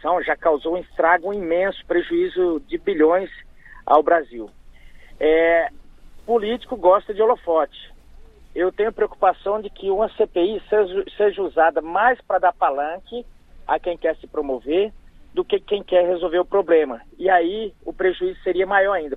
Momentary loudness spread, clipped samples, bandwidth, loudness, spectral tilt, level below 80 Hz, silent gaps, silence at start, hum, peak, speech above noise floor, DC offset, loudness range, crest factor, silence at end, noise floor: 10 LU; under 0.1%; 4.4 kHz; -20 LUFS; -7 dB/octave; -46 dBFS; none; 0.05 s; none; -2 dBFS; 24 dB; under 0.1%; 3 LU; 20 dB; 0 s; -44 dBFS